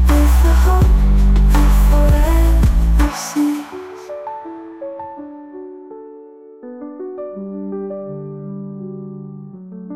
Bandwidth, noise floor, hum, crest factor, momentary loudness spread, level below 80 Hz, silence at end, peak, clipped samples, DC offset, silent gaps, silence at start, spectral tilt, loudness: 15.5 kHz; -39 dBFS; none; 12 dB; 21 LU; -16 dBFS; 0 s; -4 dBFS; under 0.1%; under 0.1%; none; 0 s; -6.5 dB/octave; -16 LUFS